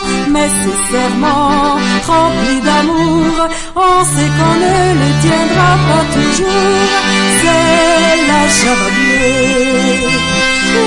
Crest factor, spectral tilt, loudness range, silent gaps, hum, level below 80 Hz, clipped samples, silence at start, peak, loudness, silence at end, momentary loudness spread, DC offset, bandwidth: 10 dB; -4 dB/octave; 2 LU; none; none; -30 dBFS; under 0.1%; 0 s; 0 dBFS; -10 LUFS; 0 s; 4 LU; under 0.1%; 11.5 kHz